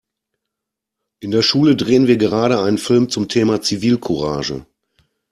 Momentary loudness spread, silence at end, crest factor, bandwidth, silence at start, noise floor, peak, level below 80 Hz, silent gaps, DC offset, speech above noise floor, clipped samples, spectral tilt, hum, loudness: 9 LU; 0.7 s; 16 dB; 13 kHz; 1.2 s; -82 dBFS; -2 dBFS; -50 dBFS; none; under 0.1%; 66 dB; under 0.1%; -5.5 dB/octave; none; -16 LUFS